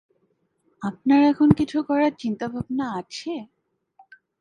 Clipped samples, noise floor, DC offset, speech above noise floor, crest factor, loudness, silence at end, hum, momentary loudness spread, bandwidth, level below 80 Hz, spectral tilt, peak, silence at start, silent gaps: under 0.1%; -69 dBFS; under 0.1%; 48 dB; 22 dB; -22 LUFS; 0.95 s; none; 15 LU; 9.4 kHz; -54 dBFS; -7 dB/octave; 0 dBFS; 0.8 s; none